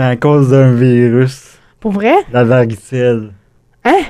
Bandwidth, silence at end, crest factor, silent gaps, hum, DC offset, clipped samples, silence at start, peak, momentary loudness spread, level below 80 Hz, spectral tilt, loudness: 11 kHz; 0 s; 10 dB; none; none; under 0.1%; under 0.1%; 0 s; 0 dBFS; 10 LU; -46 dBFS; -8 dB/octave; -11 LUFS